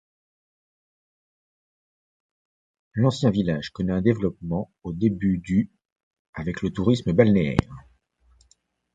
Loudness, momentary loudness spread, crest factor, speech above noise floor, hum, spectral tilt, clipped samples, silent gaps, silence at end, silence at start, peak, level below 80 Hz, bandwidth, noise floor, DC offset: -24 LUFS; 14 LU; 24 dB; 42 dB; none; -8 dB/octave; under 0.1%; 5.92-5.96 s, 6.03-6.11 s, 6.19-6.33 s; 1.15 s; 2.95 s; -2 dBFS; -46 dBFS; 9 kHz; -65 dBFS; under 0.1%